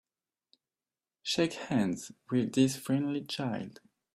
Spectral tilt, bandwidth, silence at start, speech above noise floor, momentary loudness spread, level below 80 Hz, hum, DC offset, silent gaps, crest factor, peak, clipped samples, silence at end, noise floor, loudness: -5 dB/octave; 15 kHz; 1.25 s; over 59 dB; 12 LU; -70 dBFS; none; under 0.1%; none; 20 dB; -14 dBFS; under 0.1%; 0.45 s; under -90 dBFS; -32 LUFS